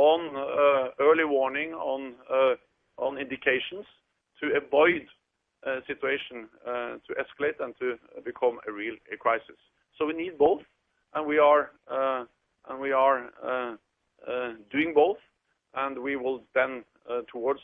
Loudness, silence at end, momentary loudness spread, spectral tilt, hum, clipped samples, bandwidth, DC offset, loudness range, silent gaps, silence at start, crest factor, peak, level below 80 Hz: -28 LUFS; 0.05 s; 13 LU; -7.5 dB/octave; none; under 0.1%; 3.8 kHz; under 0.1%; 6 LU; none; 0 s; 20 dB; -8 dBFS; -70 dBFS